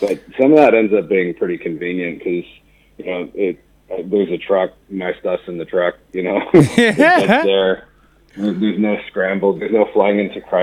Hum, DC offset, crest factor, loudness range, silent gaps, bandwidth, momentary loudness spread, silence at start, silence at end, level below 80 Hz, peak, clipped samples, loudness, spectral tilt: none; under 0.1%; 16 dB; 7 LU; none; 14 kHz; 14 LU; 0 s; 0 s; -54 dBFS; 0 dBFS; under 0.1%; -16 LUFS; -6.5 dB/octave